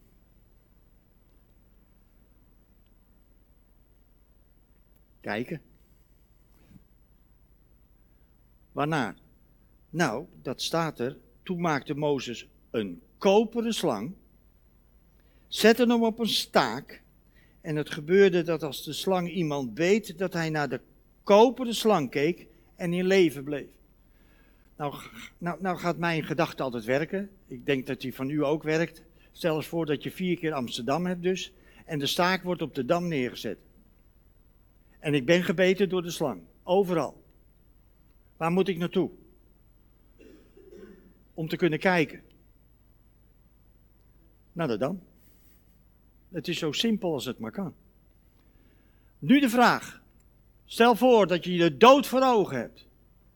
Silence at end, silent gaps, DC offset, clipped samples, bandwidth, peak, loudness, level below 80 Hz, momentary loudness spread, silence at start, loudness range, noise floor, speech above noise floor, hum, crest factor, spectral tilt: 0.65 s; none; under 0.1%; under 0.1%; 19 kHz; -4 dBFS; -27 LUFS; -60 dBFS; 16 LU; 5.25 s; 12 LU; -60 dBFS; 34 dB; none; 24 dB; -5.5 dB/octave